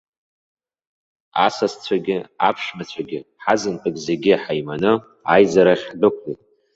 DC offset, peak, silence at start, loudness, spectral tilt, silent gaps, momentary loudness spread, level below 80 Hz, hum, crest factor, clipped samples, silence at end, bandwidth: under 0.1%; 0 dBFS; 1.35 s; -19 LUFS; -5 dB/octave; none; 14 LU; -60 dBFS; none; 20 dB; under 0.1%; 0.4 s; 8 kHz